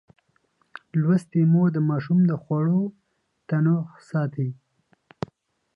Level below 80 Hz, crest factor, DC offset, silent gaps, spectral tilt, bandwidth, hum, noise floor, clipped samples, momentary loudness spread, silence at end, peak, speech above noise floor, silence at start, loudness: -66 dBFS; 14 dB; under 0.1%; none; -10 dB/octave; 5.2 kHz; none; -68 dBFS; under 0.1%; 13 LU; 1.2 s; -10 dBFS; 46 dB; 0.95 s; -23 LUFS